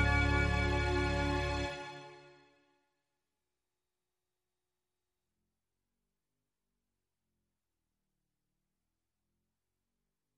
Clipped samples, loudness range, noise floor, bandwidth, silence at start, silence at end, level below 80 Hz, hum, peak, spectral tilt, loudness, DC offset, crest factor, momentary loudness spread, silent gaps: under 0.1%; 15 LU; under -90 dBFS; 11 kHz; 0 s; 8.2 s; -44 dBFS; none; -18 dBFS; -5.5 dB/octave; -33 LUFS; under 0.1%; 22 dB; 18 LU; none